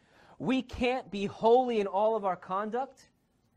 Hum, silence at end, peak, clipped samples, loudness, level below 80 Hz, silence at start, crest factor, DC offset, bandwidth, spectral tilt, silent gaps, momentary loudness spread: none; 0.65 s; -14 dBFS; under 0.1%; -30 LUFS; -56 dBFS; 0.4 s; 18 dB; under 0.1%; 9.4 kHz; -6 dB/octave; none; 11 LU